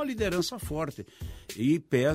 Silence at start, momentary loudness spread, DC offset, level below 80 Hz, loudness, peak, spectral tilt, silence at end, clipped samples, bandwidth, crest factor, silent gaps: 0 s; 16 LU; under 0.1%; -48 dBFS; -29 LUFS; -12 dBFS; -5.5 dB/octave; 0 s; under 0.1%; 16 kHz; 18 dB; none